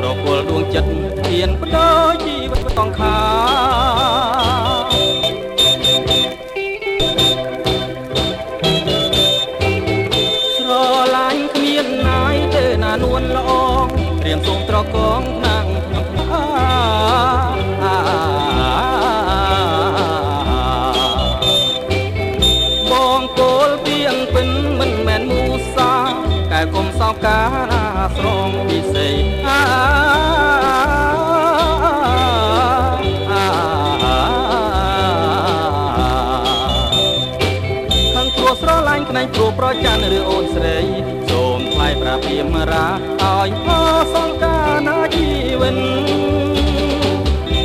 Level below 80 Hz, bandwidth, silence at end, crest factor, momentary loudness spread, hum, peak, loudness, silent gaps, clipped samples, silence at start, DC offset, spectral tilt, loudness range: -26 dBFS; 16 kHz; 0 s; 14 dB; 5 LU; none; 0 dBFS; -15 LUFS; none; under 0.1%; 0 s; under 0.1%; -5 dB/octave; 2 LU